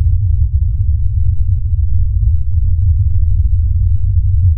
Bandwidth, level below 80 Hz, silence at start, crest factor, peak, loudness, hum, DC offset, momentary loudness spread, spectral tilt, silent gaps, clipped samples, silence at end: 0.3 kHz; -14 dBFS; 0 s; 8 dB; -2 dBFS; -15 LUFS; none; under 0.1%; 2 LU; -22.5 dB/octave; none; under 0.1%; 0 s